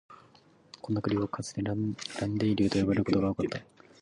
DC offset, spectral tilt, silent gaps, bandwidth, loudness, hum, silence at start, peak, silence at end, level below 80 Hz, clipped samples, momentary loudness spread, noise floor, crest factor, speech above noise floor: under 0.1%; -6.5 dB/octave; none; 11 kHz; -30 LUFS; none; 0.1 s; -14 dBFS; 0.4 s; -54 dBFS; under 0.1%; 8 LU; -60 dBFS; 18 dB; 31 dB